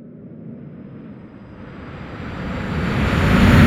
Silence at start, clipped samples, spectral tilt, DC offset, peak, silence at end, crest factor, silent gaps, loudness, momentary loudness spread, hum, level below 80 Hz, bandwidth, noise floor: 0 s; under 0.1%; -7 dB/octave; under 0.1%; 0 dBFS; 0 s; 18 dB; none; -19 LUFS; 23 LU; none; -28 dBFS; 15.5 kHz; -38 dBFS